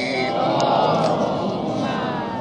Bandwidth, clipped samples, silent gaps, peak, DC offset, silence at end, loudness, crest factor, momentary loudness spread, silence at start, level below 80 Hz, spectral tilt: 10.5 kHz; under 0.1%; none; -6 dBFS; under 0.1%; 0 s; -21 LUFS; 16 dB; 6 LU; 0 s; -56 dBFS; -6 dB/octave